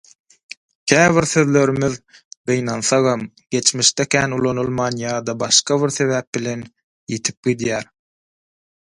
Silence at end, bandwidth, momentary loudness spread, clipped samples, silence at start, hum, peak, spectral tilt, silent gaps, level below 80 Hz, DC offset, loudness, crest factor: 1 s; 11.5 kHz; 13 LU; under 0.1%; 0.85 s; none; 0 dBFS; -3.5 dB/octave; 2.25-2.31 s, 2.37-2.44 s, 6.27-6.33 s, 6.83-7.07 s, 7.37-7.43 s; -54 dBFS; under 0.1%; -18 LUFS; 20 dB